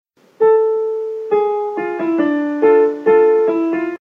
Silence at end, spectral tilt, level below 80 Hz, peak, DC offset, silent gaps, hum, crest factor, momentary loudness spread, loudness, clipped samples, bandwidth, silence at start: 0.05 s; -7.5 dB/octave; -82 dBFS; -2 dBFS; under 0.1%; none; none; 12 dB; 8 LU; -15 LUFS; under 0.1%; 3.9 kHz; 0.4 s